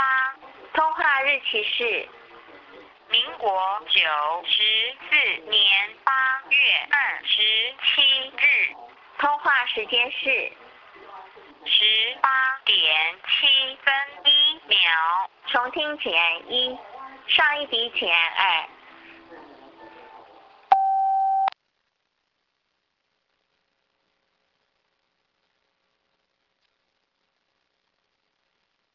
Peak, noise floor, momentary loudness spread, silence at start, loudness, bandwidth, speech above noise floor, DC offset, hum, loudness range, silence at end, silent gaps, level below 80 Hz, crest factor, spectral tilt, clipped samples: -4 dBFS; -75 dBFS; 9 LU; 0 s; -20 LUFS; 6 kHz; 53 dB; under 0.1%; none; 8 LU; 7.45 s; none; -70 dBFS; 20 dB; -2 dB/octave; under 0.1%